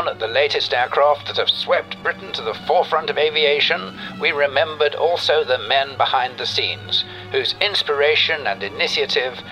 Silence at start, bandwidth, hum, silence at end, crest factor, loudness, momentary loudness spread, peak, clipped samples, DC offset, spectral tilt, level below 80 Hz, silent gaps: 0 s; 13 kHz; none; 0 s; 18 dB; -18 LUFS; 7 LU; -2 dBFS; under 0.1%; under 0.1%; -3 dB/octave; -58 dBFS; none